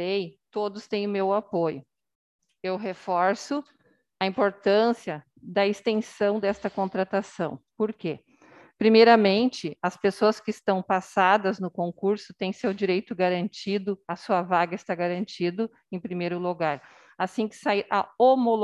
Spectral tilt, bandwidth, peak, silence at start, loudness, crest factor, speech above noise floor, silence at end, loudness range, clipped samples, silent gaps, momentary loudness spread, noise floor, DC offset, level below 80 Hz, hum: -6 dB/octave; 11.5 kHz; -4 dBFS; 0 s; -26 LUFS; 20 dB; 29 dB; 0 s; 6 LU; under 0.1%; 2.15-2.39 s; 12 LU; -54 dBFS; under 0.1%; -70 dBFS; none